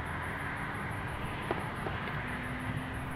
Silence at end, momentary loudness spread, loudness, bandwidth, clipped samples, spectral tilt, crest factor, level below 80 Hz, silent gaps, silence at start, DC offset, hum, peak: 0 s; 2 LU; -37 LUFS; 16 kHz; under 0.1%; -6 dB/octave; 20 dB; -50 dBFS; none; 0 s; under 0.1%; none; -16 dBFS